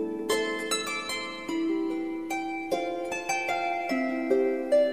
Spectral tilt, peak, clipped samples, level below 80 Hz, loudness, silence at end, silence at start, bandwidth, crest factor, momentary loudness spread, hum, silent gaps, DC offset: -2.5 dB/octave; -12 dBFS; under 0.1%; -64 dBFS; -29 LUFS; 0 s; 0 s; 15.5 kHz; 16 dB; 6 LU; none; none; 0.2%